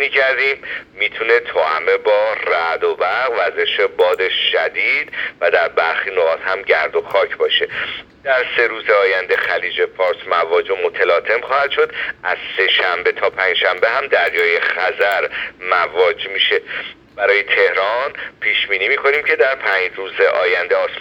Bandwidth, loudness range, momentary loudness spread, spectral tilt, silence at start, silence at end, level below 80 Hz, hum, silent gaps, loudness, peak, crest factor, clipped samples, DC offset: 17 kHz; 1 LU; 6 LU; -3 dB/octave; 0 s; 0 s; -58 dBFS; none; none; -16 LUFS; 0 dBFS; 16 dB; under 0.1%; under 0.1%